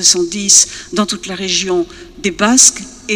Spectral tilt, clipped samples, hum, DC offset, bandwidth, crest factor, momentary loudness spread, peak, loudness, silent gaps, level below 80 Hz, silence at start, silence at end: -1 dB/octave; 0.3%; none; under 0.1%; over 20 kHz; 14 dB; 14 LU; 0 dBFS; -11 LUFS; none; -44 dBFS; 0 s; 0 s